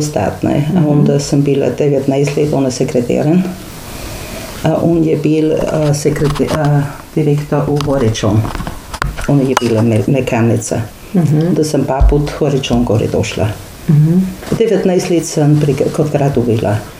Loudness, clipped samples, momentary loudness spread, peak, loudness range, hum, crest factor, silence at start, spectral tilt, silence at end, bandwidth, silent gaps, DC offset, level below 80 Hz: -13 LUFS; under 0.1%; 8 LU; 0 dBFS; 2 LU; none; 12 dB; 0 s; -6.5 dB/octave; 0 s; 16 kHz; none; under 0.1%; -26 dBFS